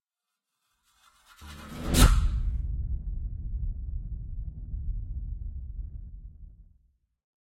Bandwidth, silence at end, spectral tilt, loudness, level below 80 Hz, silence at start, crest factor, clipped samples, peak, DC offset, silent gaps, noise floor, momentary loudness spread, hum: 16 kHz; 0.9 s; -4.5 dB/octave; -31 LUFS; -32 dBFS; 1.4 s; 24 dB; under 0.1%; -6 dBFS; under 0.1%; none; -87 dBFS; 24 LU; none